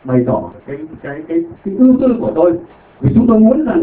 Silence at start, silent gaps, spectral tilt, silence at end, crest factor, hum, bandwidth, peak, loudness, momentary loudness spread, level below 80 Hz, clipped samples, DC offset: 0.05 s; none; -13.5 dB/octave; 0 s; 14 dB; none; 4 kHz; 0 dBFS; -13 LUFS; 17 LU; -40 dBFS; under 0.1%; under 0.1%